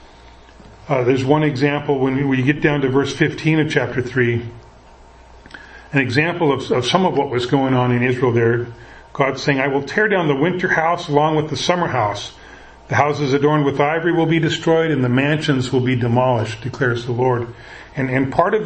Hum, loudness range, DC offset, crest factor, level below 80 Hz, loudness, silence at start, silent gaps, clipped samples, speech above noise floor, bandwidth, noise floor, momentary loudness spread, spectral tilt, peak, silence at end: none; 3 LU; under 0.1%; 18 dB; -48 dBFS; -18 LUFS; 0 s; none; under 0.1%; 27 dB; 8.8 kHz; -44 dBFS; 6 LU; -6.5 dB/octave; 0 dBFS; 0 s